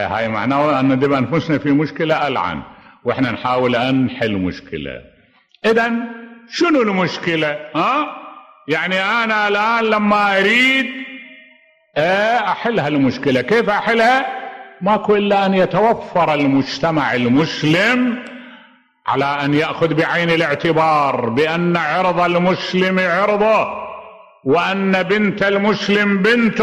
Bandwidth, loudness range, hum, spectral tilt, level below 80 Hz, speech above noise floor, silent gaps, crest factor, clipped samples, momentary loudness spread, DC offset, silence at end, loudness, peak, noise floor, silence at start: 13 kHz; 4 LU; none; -6 dB/octave; -54 dBFS; 37 dB; none; 12 dB; under 0.1%; 12 LU; under 0.1%; 0 s; -16 LUFS; -4 dBFS; -53 dBFS; 0 s